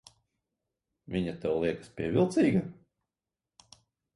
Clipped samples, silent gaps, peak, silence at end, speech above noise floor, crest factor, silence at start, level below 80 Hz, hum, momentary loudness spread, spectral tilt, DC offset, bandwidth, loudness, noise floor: under 0.1%; none; -14 dBFS; 1.4 s; over 61 dB; 20 dB; 1.1 s; -60 dBFS; none; 11 LU; -7.5 dB/octave; under 0.1%; 11.5 kHz; -30 LUFS; under -90 dBFS